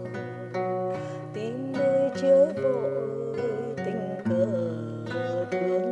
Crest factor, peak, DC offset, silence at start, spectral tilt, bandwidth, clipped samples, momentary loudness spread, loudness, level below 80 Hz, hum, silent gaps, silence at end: 16 dB; -10 dBFS; under 0.1%; 0 s; -7.5 dB/octave; 8.6 kHz; under 0.1%; 13 LU; -27 LUFS; -72 dBFS; none; none; 0 s